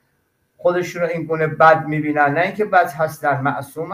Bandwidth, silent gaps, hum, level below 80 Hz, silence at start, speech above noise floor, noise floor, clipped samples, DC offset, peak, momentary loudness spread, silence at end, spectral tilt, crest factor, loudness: 16 kHz; none; none; -60 dBFS; 0.6 s; 48 dB; -66 dBFS; under 0.1%; under 0.1%; 0 dBFS; 9 LU; 0 s; -6.5 dB/octave; 18 dB; -18 LUFS